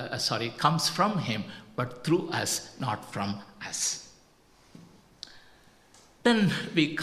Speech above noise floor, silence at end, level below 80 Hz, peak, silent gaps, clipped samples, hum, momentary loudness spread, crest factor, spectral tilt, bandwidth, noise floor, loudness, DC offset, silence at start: 31 dB; 0 s; -64 dBFS; -8 dBFS; none; under 0.1%; none; 13 LU; 22 dB; -4 dB/octave; 15 kHz; -60 dBFS; -29 LUFS; under 0.1%; 0 s